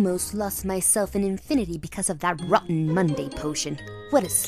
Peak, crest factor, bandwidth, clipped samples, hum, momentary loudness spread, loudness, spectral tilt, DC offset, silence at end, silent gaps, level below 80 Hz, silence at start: -4 dBFS; 20 dB; 15 kHz; under 0.1%; none; 8 LU; -25 LUFS; -4.5 dB/octave; under 0.1%; 0 s; none; -46 dBFS; 0 s